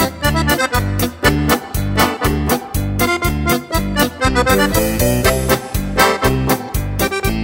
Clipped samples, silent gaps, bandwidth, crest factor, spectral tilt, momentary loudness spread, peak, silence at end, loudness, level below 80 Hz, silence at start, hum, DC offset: under 0.1%; none; 17 kHz; 16 dB; -4.5 dB/octave; 5 LU; 0 dBFS; 0 s; -16 LUFS; -24 dBFS; 0 s; none; under 0.1%